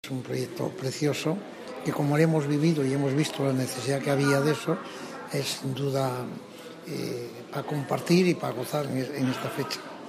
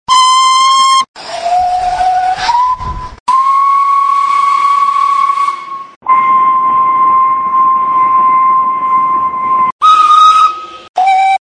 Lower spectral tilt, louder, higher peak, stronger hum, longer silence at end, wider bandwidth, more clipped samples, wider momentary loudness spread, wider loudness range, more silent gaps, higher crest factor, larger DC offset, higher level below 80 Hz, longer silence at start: first, -6 dB/octave vs -1 dB/octave; second, -28 LUFS vs -9 LUFS; second, -10 dBFS vs 0 dBFS; neither; about the same, 0 s vs 0.05 s; first, 15.5 kHz vs 10 kHz; neither; first, 12 LU vs 8 LU; about the same, 5 LU vs 3 LU; second, none vs 1.08-1.14 s, 3.20-3.26 s, 5.96-6.01 s, 9.72-9.79 s, 10.89-10.94 s; first, 18 dB vs 10 dB; neither; second, -72 dBFS vs -40 dBFS; about the same, 0.05 s vs 0.1 s